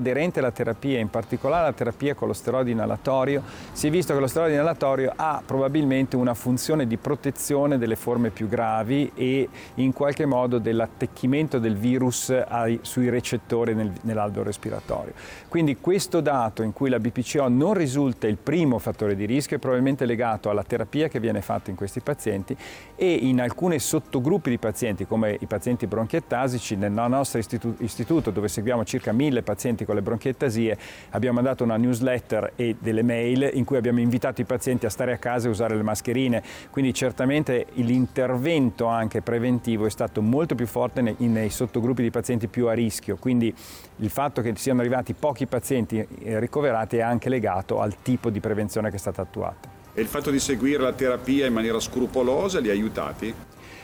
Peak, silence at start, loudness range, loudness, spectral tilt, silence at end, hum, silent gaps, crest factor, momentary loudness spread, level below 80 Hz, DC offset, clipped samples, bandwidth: -12 dBFS; 0 s; 2 LU; -24 LUFS; -6 dB/octave; 0 s; none; none; 12 dB; 6 LU; -52 dBFS; under 0.1%; under 0.1%; over 20 kHz